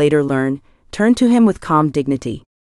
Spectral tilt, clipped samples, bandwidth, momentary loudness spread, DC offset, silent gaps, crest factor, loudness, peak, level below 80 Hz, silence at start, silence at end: -7 dB/octave; under 0.1%; 11.5 kHz; 14 LU; under 0.1%; none; 14 dB; -16 LUFS; -2 dBFS; -46 dBFS; 0 s; 0.2 s